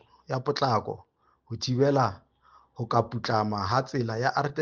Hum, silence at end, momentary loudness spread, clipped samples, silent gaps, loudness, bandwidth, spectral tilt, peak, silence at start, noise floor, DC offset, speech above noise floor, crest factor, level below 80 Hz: none; 0 s; 12 LU; under 0.1%; none; -27 LUFS; 7.2 kHz; -6 dB/octave; -10 dBFS; 0.3 s; -60 dBFS; under 0.1%; 33 dB; 18 dB; -64 dBFS